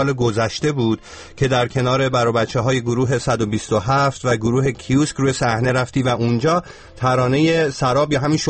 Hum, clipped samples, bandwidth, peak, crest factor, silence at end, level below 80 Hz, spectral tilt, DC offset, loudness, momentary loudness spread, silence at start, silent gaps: none; under 0.1%; 8.8 kHz; -4 dBFS; 14 dB; 0 s; -44 dBFS; -6 dB/octave; 0.1%; -18 LUFS; 4 LU; 0 s; none